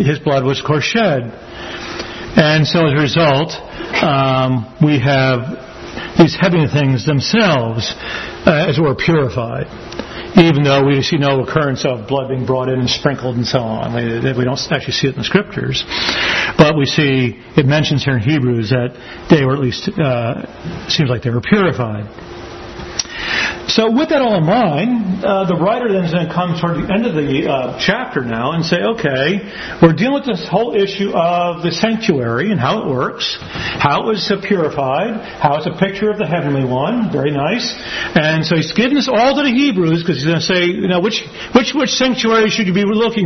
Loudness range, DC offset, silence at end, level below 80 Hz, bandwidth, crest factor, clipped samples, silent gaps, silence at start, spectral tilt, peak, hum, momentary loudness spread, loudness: 3 LU; under 0.1%; 0 s; -42 dBFS; 6.4 kHz; 14 dB; under 0.1%; none; 0 s; -6 dB/octave; 0 dBFS; none; 9 LU; -15 LUFS